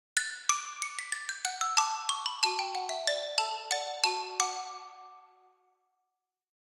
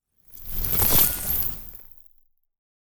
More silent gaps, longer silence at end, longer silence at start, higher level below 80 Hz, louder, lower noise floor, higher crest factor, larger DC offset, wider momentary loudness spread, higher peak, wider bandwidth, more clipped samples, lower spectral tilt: neither; first, 1.5 s vs 0.4 s; first, 0.15 s vs 0 s; second, under -90 dBFS vs -38 dBFS; second, -31 LUFS vs -20 LUFS; first, -86 dBFS vs -60 dBFS; about the same, 26 dB vs 22 dB; neither; second, 9 LU vs 23 LU; second, -8 dBFS vs -4 dBFS; second, 16.5 kHz vs over 20 kHz; neither; second, 4 dB/octave vs -2.5 dB/octave